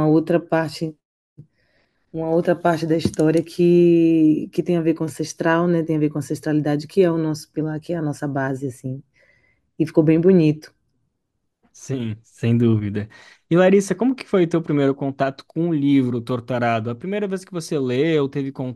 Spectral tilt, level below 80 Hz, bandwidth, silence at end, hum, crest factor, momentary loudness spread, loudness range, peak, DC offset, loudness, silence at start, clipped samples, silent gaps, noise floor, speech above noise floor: -7.5 dB/octave; -58 dBFS; 12.5 kHz; 0 s; none; 18 dB; 12 LU; 5 LU; -2 dBFS; under 0.1%; -20 LUFS; 0 s; under 0.1%; 1.05-1.36 s; -75 dBFS; 56 dB